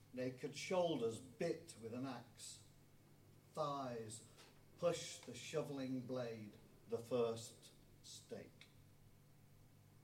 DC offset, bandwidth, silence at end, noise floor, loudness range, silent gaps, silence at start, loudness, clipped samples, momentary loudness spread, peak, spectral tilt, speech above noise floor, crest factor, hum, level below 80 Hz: under 0.1%; 16.5 kHz; 0.05 s; -67 dBFS; 4 LU; none; 0 s; -46 LUFS; under 0.1%; 21 LU; -28 dBFS; -5 dB/octave; 22 dB; 20 dB; none; -78 dBFS